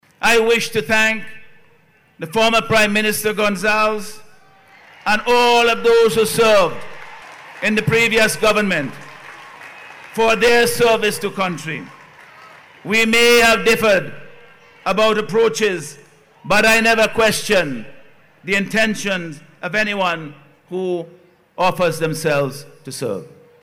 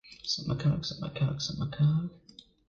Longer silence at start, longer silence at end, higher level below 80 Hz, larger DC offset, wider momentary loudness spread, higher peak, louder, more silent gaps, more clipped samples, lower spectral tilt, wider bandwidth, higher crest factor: first, 0.2 s vs 0.05 s; second, 0.35 s vs 0.5 s; first, -48 dBFS vs -54 dBFS; neither; first, 22 LU vs 6 LU; first, -8 dBFS vs -18 dBFS; first, -16 LUFS vs -31 LUFS; neither; neither; second, -3.5 dB/octave vs -6 dB/octave; first, 16.5 kHz vs 7.2 kHz; about the same, 10 dB vs 14 dB